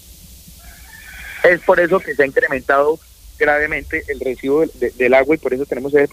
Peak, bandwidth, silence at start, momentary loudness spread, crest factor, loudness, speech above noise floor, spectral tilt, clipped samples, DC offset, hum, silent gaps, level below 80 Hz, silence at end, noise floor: 0 dBFS; 15.5 kHz; 0.3 s; 10 LU; 16 dB; -16 LUFS; 25 dB; -5.5 dB/octave; under 0.1%; under 0.1%; none; none; -42 dBFS; 0.05 s; -40 dBFS